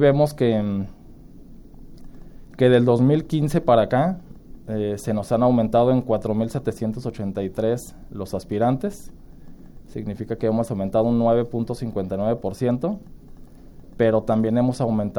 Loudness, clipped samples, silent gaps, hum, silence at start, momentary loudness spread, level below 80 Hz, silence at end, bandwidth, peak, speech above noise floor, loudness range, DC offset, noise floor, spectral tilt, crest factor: -22 LUFS; under 0.1%; none; none; 0 s; 13 LU; -44 dBFS; 0 s; 17 kHz; -4 dBFS; 22 dB; 6 LU; under 0.1%; -43 dBFS; -8 dB/octave; 18 dB